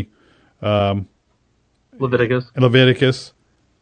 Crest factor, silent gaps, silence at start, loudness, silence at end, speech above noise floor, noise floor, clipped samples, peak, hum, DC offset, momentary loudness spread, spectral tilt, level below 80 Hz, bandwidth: 18 dB; none; 0 s; -17 LUFS; 0.55 s; 46 dB; -63 dBFS; under 0.1%; 0 dBFS; none; under 0.1%; 15 LU; -7 dB/octave; -54 dBFS; 9.2 kHz